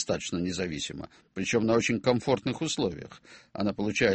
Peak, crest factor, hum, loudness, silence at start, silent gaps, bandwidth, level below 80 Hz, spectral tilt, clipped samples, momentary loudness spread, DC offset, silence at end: -8 dBFS; 20 dB; none; -29 LUFS; 0 s; none; 8.8 kHz; -56 dBFS; -4.5 dB/octave; under 0.1%; 17 LU; under 0.1%; 0 s